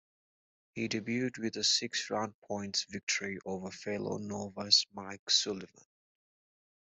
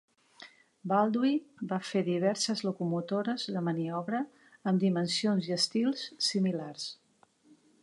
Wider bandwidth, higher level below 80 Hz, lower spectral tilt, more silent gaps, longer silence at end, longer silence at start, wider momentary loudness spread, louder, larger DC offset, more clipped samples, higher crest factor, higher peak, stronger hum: second, 8.2 kHz vs 11.5 kHz; first, -76 dBFS vs -82 dBFS; second, -2 dB/octave vs -5 dB/octave; first, 2.34-2.42 s, 3.03-3.07 s, 5.19-5.27 s vs none; first, 1.2 s vs 0.9 s; first, 0.75 s vs 0.4 s; first, 14 LU vs 8 LU; about the same, -32 LUFS vs -31 LUFS; neither; neither; first, 26 dB vs 18 dB; first, -10 dBFS vs -14 dBFS; neither